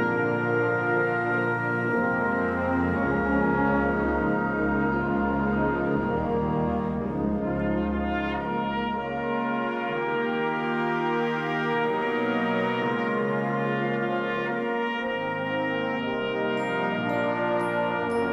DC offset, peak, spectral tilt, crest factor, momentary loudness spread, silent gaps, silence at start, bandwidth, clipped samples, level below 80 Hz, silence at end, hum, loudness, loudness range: under 0.1%; -12 dBFS; -8 dB/octave; 14 dB; 4 LU; none; 0 s; 10.5 kHz; under 0.1%; -46 dBFS; 0 s; none; -26 LUFS; 3 LU